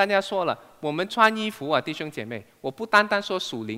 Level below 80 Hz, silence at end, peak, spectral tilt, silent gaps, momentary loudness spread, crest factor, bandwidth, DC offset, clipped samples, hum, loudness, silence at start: -72 dBFS; 0 s; -2 dBFS; -4 dB/octave; none; 14 LU; 22 dB; 16 kHz; under 0.1%; under 0.1%; none; -24 LUFS; 0 s